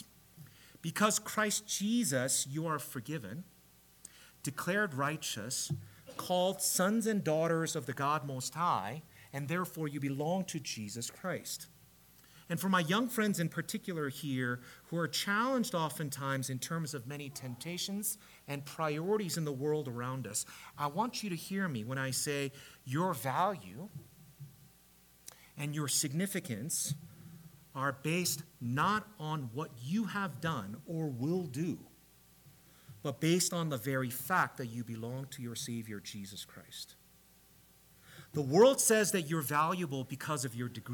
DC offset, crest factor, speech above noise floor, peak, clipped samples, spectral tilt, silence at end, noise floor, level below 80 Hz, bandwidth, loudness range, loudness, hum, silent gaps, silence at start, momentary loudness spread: under 0.1%; 22 dB; 28 dB; -14 dBFS; under 0.1%; -4 dB/octave; 0 s; -63 dBFS; -72 dBFS; 19 kHz; 6 LU; -35 LUFS; none; none; 0 s; 15 LU